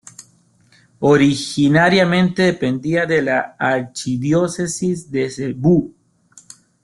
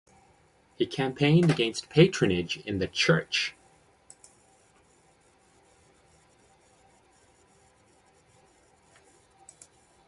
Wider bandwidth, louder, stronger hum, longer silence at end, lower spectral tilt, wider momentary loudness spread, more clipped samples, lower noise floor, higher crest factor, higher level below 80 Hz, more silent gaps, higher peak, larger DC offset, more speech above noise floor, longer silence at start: about the same, 12 kHz vs 11.5 kHz; first, -17 LUFS vs -25 LUFS; neither; second, 0.95 s vs 6.6 s; about the same, -5.5 dB/octave vs -5.5 dB/octave; about the same, 9 LU vs 10 LU; neither; second, -55 dBFS vs -63 dBFS; second, 16 dB vs 24 dB; about the same, -54 dBFS vs -58 dBFS; neither; first, -2 dBFS vs -6 dBFS; neither; about the same, 38 dB vs 38 dB; first, 1 s vs 0.8 s